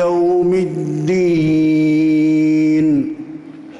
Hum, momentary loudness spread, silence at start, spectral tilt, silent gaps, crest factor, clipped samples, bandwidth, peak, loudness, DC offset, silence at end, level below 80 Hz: none; 10 LU; 0 s; -8 dB/octave; none; 6 dB; under 0.1%; 7.8 kHz; -8 dBFS; -15 LUFS; under 0.1%; 0 s; -52 dBFS